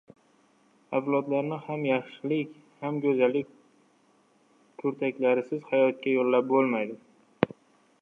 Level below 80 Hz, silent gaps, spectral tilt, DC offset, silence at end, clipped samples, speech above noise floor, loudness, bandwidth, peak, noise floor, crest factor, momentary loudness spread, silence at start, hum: -74 dBFS; none; -8.5 dB/octave; under 0.1%; 0.55 s; under 0.1%; 38 dB; -28 LUFS; 6 kHz; -4 dBFS; -64 dBFS; 26 dB; 9 LU; 0.9 s; none